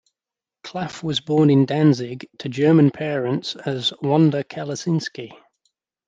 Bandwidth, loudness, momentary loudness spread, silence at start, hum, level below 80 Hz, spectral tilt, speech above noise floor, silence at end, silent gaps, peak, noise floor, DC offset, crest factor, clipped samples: 7.8 kHz; -20 LUFS; 16 LU; 0.65 s; none; -66 dBFS; -6.5 dB/octave; 70 dB; 0.75 s; none; -4 dBFS; -89 dBFS; under 0.1%; 16 dB; under 0.1%